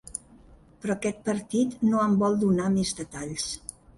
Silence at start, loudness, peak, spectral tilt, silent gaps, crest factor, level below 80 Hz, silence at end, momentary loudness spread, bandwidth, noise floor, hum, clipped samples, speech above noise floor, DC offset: 0.05 s; -26 LUFS; -14 dBFS; -5.5 dB/octave; none; 14 dB; -54 dBFS; 0.4 s; 13 LU; 11.5 kHz; -53 dBFS; none; under 0.1%; 28 dB; under 0.1%